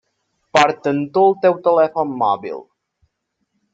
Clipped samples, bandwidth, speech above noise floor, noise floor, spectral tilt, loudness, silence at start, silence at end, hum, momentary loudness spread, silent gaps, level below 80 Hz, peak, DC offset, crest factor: under 0.1%; 7.8 kHz; 56 dB; -72 dBFS; -5 dB/octave; -17 LUFS; 0.55 s; 1.1 s; none; 9 LU; none; -64 dBFS; 0 dBFS; under 0.1%; 18 dB